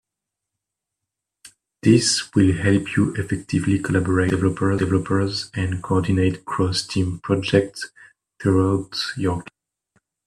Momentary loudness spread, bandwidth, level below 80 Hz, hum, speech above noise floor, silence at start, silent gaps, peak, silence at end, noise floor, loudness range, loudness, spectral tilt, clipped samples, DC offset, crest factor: 8 LU; 12 kHz; -52 dBFS; none; 64 dB; 1.85 s; none; -2 dBFS; 0.85 s; -84 dBFS; 3 LU; -21 LUFS; -5.5 dB/octave; under 0.1%; under 0.1%; 20 dB